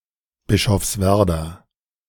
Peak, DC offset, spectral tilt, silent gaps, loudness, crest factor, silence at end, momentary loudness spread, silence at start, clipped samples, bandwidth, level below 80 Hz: -4 dBFS; under 0.1%; -5 dB/octave; none; -19 LUFS; 18 dB; 0.55 s; 9 LU; 0.5 s; under 0.1%; 18 kHz; -36 dBFS